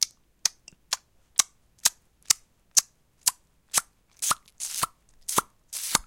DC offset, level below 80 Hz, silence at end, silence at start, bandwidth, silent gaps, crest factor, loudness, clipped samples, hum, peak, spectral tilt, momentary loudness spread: under 0.1%; -62 dBFS; 0.05 s; 0 s; 17 kHz; none; 30 dB; -27 LUFS; under 0.1%; none; 0 dBFS; 1 dB/octave; 9 LU